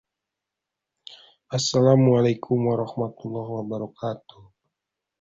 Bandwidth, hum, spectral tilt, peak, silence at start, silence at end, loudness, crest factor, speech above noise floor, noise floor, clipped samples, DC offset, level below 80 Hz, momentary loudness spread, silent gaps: 8 kHz; none; -6.5 dB/octave; -4 dBFS; 1.1 s; 1.05 s; -23 LUFS; 20 dB; 63 dB; -86 dBFS; under 0.1%; under 0.1%; -62 dBFS; 15 LU; none